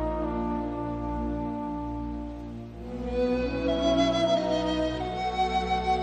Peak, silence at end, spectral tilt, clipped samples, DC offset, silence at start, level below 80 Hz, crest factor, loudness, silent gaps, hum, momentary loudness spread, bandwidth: -12 dBFS; 0 s; -6 dB/octave; under 0.1%; under 0.1%; 0 s; -40 dBFS; 16 dB; -28 LUFS; none; none; 12 LU; 8.8 kHz